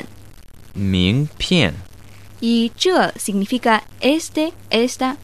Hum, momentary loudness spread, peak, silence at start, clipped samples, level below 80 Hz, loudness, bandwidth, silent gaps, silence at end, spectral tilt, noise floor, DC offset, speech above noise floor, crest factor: none; 8 LU; -2 dBFS; 0 s; under 0.1%; -44 dBFS; -18 LUFS; 14 kHz; none; 0.05 s; -5 dB/octave; -42 dBFS; 0.8%; 24 dB; 18 dB